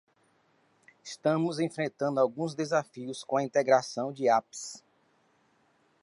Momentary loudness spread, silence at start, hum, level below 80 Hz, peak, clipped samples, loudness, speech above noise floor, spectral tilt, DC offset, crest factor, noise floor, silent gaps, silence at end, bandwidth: 15 LU; 1.05 s; none; -84 dBFS; -10 dBFS; under 0.1%; -29 LUFS; 40 dB; -5 dB/octave; under 0.1%; 20 dB; -69 dBFS; none; 1.25 s; 11.5 kHz